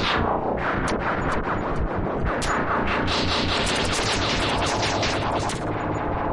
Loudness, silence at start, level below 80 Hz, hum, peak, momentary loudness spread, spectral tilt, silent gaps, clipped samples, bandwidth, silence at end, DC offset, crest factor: -24 LUFS; 0 s; -34 dBFS; none; -10 dBFS; 4 LU; -4 dB/octave; none; under 0.1%; 11.5 kHz; 0 s; under 0.1%; 14 dB